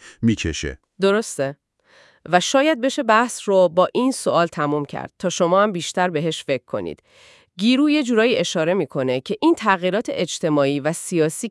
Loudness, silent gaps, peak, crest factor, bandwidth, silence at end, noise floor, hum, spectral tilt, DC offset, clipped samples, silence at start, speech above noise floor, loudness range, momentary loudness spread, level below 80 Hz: -20 LUFS; none; 0 dBFS; 20 dB; 12 kHz; 0 s; -54 dBFS; none; -4.5 dB/octave; under 0.1%; under 0.1%; 0.05 s; 34 dB; 3 LU; 8 LU; -50 dBFS